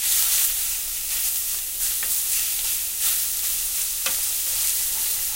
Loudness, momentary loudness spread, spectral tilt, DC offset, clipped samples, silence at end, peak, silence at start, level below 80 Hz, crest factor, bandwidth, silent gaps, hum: -21 LUFS; 5 LU; 2.5 dB/octave; under 0.1%; under 0.1%; 0 s; -4 dBFS; 0 s; -48 dBFS; 20 dB; 16 kHz; none; none